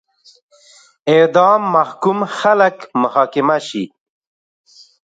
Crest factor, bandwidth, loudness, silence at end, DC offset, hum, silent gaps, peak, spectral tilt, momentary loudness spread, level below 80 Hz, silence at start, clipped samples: 16 dB; 9.2 kHz; -15 LUFS; 1.2 s; under 0.1%; none; none; 0 dBFS; -5.5 dB/octave; 13 LU; -68 dBFS; 1.05 s; under 0.1%